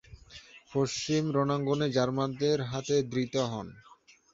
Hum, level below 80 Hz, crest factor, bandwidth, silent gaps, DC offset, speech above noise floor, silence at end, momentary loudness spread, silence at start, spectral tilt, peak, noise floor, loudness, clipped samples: none; -62 dBFS; 16 dB; 7.8 kHz; none; under 0.1%; 23 dB; 0.55 s; 19 LU; 0.1 s; -5.5 dB/octave; -14 dBFS; -52 dBFS; -30 LUFS; under 0.1%